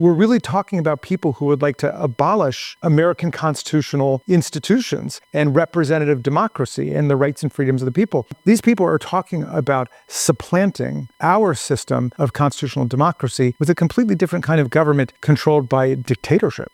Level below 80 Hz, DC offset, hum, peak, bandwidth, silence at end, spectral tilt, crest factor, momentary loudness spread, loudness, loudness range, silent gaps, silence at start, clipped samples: -54 dBFS; under 0.1%; none; 0 dBFS; 15.5 kHz; 0.1 s; -6.5 dB/octave; 16 dB; 6 LU; -18 LUFS; 2 LU; none; 0 s; under 0.1%